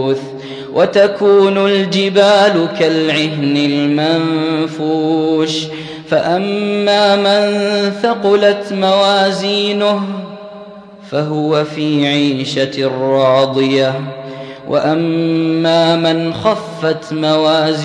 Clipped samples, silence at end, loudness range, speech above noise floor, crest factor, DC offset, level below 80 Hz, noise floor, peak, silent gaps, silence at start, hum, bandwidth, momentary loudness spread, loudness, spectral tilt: under 0.1%; 0 s; 4 LU; 21 dB; 14 dB; under 0.1%; -60 dBFS; -34 dBFS; 0 dBFS; none; 0 s; none; 10.5 kHz; 10 LU; -13 LUFS; -5.5 dB/octave